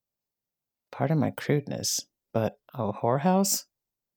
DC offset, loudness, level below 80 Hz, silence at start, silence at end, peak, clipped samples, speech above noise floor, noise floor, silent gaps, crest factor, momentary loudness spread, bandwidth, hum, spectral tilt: under 0.1%; -28 LUFS; -72 dBFS; 0.9 s; 0.55 s; -10 dBFS; under 0.1%; 62 dB; -89 dBFS; none; 18 dB; 10 LU; over 20 kHz; none; -4.5 dB/octave